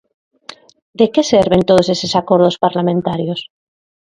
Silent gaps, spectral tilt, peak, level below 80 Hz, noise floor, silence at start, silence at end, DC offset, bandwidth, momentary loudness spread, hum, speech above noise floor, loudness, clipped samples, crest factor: 0.82-0.93 s; -6 dB/octave; 0 dBFS; -48 dBFS; -39 dBFS; 0.5 s; 0.7 s; under 0.1%; 11 kHz; 8 LU; none; 26 dB; -14 LUFS; under 0.1%; 16 dB